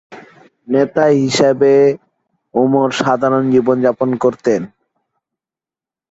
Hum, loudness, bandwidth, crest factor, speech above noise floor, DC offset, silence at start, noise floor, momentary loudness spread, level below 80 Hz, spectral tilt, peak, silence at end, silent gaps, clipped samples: none; -14 LUFS; 8 kHz; 14 dB; 77 dB; under 0.1%; 0.1 s; -90 dBFS; 8 LU; -58 dBFS; -6 dB/octave; -2 dBFS; 1.45 s; none; under 0.1%